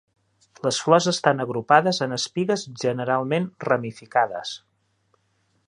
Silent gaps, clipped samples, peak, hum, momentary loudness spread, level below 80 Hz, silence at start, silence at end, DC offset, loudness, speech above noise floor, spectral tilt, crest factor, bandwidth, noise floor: none; under 0.1%; -2 dBFS; none; 8 LU; -68 dBFS; 0.65 s; 1.1 s; under 0.1%; -23 LUFS; 46 dB; -4.5 dB/octave; 22 dB; 11 kHz; -68 dBFS